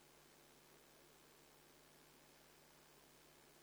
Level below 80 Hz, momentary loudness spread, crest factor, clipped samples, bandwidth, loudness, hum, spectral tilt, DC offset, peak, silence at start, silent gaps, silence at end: -86 dBFS; 0 LU; 18 dB; under 0.1%; over 20 kHz; -66 LUFS; none; -2.5 dB/octave; under 0.1%; -50 dBFS; 0 s; none; 0 s